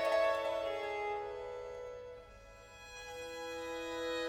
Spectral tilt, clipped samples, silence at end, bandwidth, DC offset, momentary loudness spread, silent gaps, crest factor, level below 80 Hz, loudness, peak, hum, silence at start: -3 dB/octave; under 0.1%; 0 s; 16.5 kHz; under 0.1%; 20 LU; none; 18 dB; -64 dBFS; -39 LUFS; -22 dBFS; none; 0 s